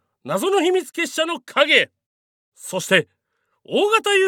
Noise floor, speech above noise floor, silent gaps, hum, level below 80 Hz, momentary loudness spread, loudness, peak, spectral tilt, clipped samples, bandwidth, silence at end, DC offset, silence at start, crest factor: -72 dBFS; 53 dB; 2.06-2.52 s; none; -86 dBFS; 13 LU; -19 LUFS; 0 dBFS; -3 dB/octave; under 0.1%; 18.5 kHz; 0 s; under 0.1%; 0.25 s; 20 dB